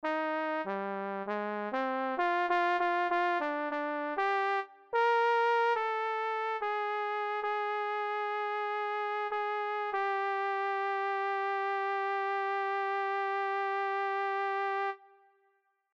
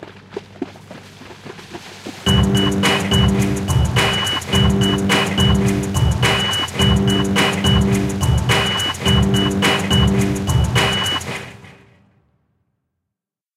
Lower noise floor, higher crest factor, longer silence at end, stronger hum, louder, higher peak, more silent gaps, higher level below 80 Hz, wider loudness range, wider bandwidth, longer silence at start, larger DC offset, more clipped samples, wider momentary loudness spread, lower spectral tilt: second, -74 dBFS vs -83 dBFS; about the same, 14 dB vs 16 dB; second, 0.9 s vs 1.85 s; neither; second, -32 LUFS vs -16 LUFS; second, -18 dBFS vs -2 dBFS; neither; second, -84 dBFS vs -28 dBFS; about the same, 3 LU vs 4 LU; second, 8 kHz vs 16 kHz; about the same, 0.05 s vs 0 s; neither; neither; second, 6 LU vs 18 LU; about the same, -5 dB/octave vs -4.5 dB/octave